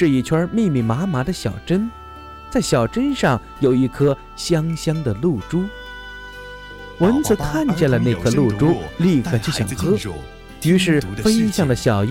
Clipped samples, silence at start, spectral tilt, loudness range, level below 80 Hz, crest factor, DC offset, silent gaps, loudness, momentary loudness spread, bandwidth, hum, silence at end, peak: under 0.1%; 0 s; -6 dB/octave; 3 LU; -38 dBFS; 16 dB; under 0.1%; none; -19 LUFS; 17 LU; 16.5 kHz; none; 0 s; -4 dBFS